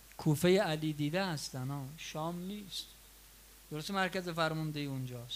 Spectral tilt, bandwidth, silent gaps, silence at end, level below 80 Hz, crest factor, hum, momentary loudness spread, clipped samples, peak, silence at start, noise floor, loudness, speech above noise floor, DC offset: -5.5 dB/octave; 16 kHz; none; 0 s; -62 dBFS; 18 dB; none; 13 LU; under 0.1%; -18 dBFS; 0 s; -58 dBFS; -35 LUFS; 23 dB; under 0.1%